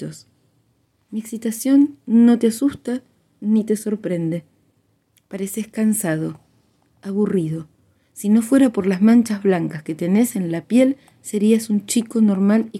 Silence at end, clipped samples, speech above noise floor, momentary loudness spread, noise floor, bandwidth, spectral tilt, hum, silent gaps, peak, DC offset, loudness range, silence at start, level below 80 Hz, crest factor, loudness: 0 s; under 0.1%; 45 dB; 15 LU; -64 dBFS; 15.5 kHz; -6 dB/octave; none; none; -4 dBFS; under 0.1%; 7 LU; 0 s; -64 dBFS; 16 dB; -19 LUFS